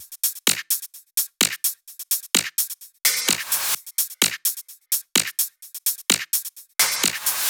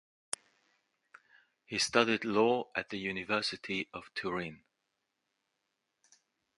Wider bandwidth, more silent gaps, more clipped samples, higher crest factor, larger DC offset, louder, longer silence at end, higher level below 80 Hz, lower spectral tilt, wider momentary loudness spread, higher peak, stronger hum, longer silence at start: first, over 20 kHz vs 11.5 kHz; neither; neither; about the same, 24 dB vs 28 dB; neither; first, -21 LUFS vs -33 LUFS; second, 0 s vs 2 s; about the same, -74 dBFS vs -72 dBFS; second, 0.5 dB/octave vs -3 dB/octave; second, 5 LU vs 14 LU; first, -2 dBFS vs -10 dBFS; neither; second, 0 s vs 1.7 s